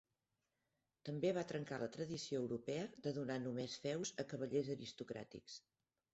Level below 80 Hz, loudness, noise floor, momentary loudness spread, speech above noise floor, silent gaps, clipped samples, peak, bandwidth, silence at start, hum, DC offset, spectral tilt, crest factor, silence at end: -80 dBFS; -44 LUFS; -89 dBFS; 11 LU; 45 dB; none; under 0.1%; -28 dBFS; 8 kHz; 1.05 s; none; under 0.1%; -5.5 dB/octave; 18 dB; 0.55 s